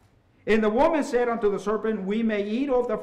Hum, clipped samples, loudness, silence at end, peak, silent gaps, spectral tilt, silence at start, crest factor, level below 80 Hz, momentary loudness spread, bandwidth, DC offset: none; under 0.1%; -24 LUFS; 0 s; -12 dBFS; none; -6 dB/octave; 0.45 s; 12 dB; -48 dBFS; 5 LU; 10.5 kHz; under 0.1%